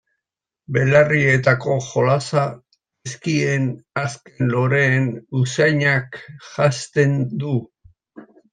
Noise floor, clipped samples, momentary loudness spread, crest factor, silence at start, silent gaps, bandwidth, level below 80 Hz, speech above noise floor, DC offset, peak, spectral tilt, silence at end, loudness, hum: -85 dBFS; under 0.1%; 11 LU; 18 dB; 0.7 s; none; 9.4 kHz; -58 dBFS; 66 dB; under 0.1%; -2 dBFS; -6 dB/octave; 0.3 s; -19 LUFS; none